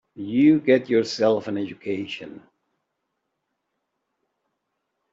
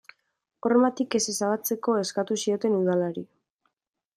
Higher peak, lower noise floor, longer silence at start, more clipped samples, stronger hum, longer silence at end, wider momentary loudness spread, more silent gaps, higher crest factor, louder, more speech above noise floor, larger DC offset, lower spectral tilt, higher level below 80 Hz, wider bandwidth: first, -6 dBFS vs -10 dBFS; about the same, -78 dBFS vs -76 dBFS; second, 0.15 s vs 0.65 s; neither; neither; first, 2.75 s vs 0.9 s; first, 15 LU vs 6 LU; neither; about the same, 18 dB vs 18 dB; first, -22 LUFS vs -25 LUFS; first, 57 dB vs 51 dB; neither; first, -6 dB/octave vs -4.5 dB/octave; about the same, -70 dBFS vs -74 dBFS; second, 7.6 kHz vs 15.5 kHz